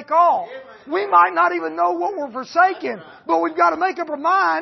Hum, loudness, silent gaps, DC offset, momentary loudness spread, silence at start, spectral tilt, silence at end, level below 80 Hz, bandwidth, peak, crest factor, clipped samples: none; -19 LUFS; none; under 0.1%; 13 LU; 0 s; -4.5 dB/octave; 0 s; -72 dBFS; 6.2 kHz; -4 dBFS; 16 dB; under 0.1%